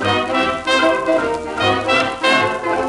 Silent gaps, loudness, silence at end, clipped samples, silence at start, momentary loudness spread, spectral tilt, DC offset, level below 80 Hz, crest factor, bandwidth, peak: none; -16 LUFS; 0 s; under 0.1%; 0 s; 4 LU; -4 dB/octave; under 0.1%; -46 dBFS; 14 dB; 11.5 kHz; -2 dBFS